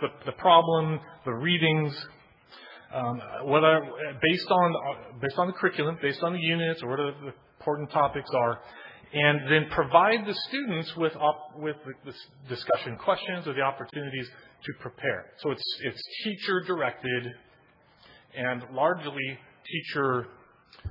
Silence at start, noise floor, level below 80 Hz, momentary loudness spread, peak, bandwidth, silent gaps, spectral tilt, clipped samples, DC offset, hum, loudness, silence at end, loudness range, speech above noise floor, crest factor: 0 s; -60 dBFS; -64 dBFS; 18 LU; -4 dBFS; 5.6 kHz; none; -8 dB/octave; under 0.1%; under 0.1%; none; -27 LUFS; 0 s; 6 LU; 33 dB; 24 dB